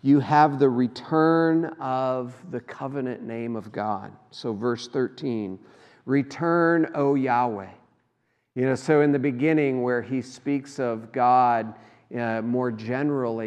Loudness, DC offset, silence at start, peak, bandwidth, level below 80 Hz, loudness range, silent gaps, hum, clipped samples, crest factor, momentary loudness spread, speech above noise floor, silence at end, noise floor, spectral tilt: -24 LUFS; under 0.1%; 0.05 s; -4 dBFS; 9.4 kHz; -76 dBFS; 7 LU; none; none; under 0.1%; 20 dB; 14 LU; 48 dB; 0 s; -72 dBFS; -7.5 dB/octave